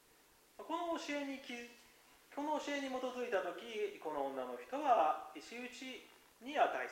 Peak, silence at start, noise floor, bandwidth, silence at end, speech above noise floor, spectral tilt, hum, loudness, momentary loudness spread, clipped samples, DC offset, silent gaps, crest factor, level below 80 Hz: -20 dBFS; 0.6 s; -68 dBFS; 16 kHz; 0 s; 28 dB; -2.5 dB/octave; none; -40 LUFS; 15 LU; under 0.1%; under 0.1%; none; 20 dB; -80 dBFS